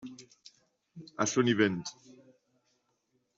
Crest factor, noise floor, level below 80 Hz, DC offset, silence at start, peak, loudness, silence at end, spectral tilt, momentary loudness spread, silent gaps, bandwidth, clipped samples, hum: 24 dB; -77 dBFS; -74 dBFS; under 0.1%; 0.05 s; -12 dBFS; -29 LUFS; 1.45 s; -4.5 dB/octave; 24 LU; none; 8 kHz; under 0.1%; none